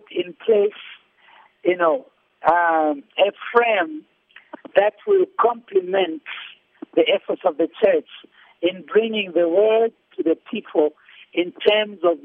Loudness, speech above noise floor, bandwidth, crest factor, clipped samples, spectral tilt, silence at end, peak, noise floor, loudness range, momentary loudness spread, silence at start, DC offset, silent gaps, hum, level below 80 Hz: -20 LUFS; 33 dB; 4.3 kHz; 18 dB; under 0.1%; -7 dB/octave; 0.05 s; -2 dBFS; -52 dBFS; 2 LU; 9 LU; 0.1 s; under 0.1%; none; none; -68 dBFS